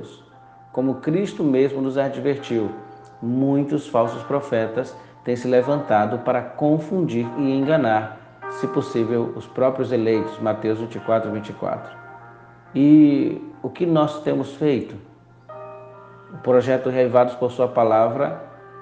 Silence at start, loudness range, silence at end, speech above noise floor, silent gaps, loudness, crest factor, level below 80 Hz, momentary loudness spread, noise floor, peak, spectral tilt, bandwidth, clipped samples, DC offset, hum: 0 s; 4 LU; 0 s; 27 dB; none; -21 LUFS; 18 dB; -64 dBFS; 17 LU; -47 dBFS; -4 dBFS; -8 dB/octave; 8.6 kHz; under 0.1%; under 0.1%; none